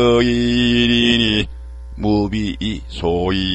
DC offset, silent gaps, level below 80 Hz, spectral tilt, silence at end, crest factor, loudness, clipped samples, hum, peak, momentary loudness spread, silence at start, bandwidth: under 0.1%; none; -30 dBFS; -5.5 dB/octave; 0 s; 16 dB; -17 LUFS; under 0.1%; none; -2 dBFS; 11 LU; 0 s; 8.4 kHz